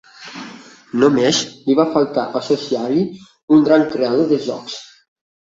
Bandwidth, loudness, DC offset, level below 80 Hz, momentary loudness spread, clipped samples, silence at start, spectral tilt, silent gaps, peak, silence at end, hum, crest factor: 7.8 kHz; -17 LUFS; under 0.1%; -60 dBFS; 19 LU; under 0.1%; 0.2 s; -5 dB/octave; 3.43-3.48 s; -2 dBFS; 0.7 s; none; 16 dB